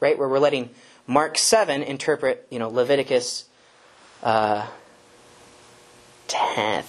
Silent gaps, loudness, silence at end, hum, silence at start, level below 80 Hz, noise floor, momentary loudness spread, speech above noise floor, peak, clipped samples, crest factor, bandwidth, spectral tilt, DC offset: none; -22 LUFS; 0 s; none; 0 s; -66 dBFS; -54 dBFS; 11 LU; 32 dB; -4 dBFS; under 0.1%; 20 dB; 13 kHz; -3 dB/octave; under 0.1%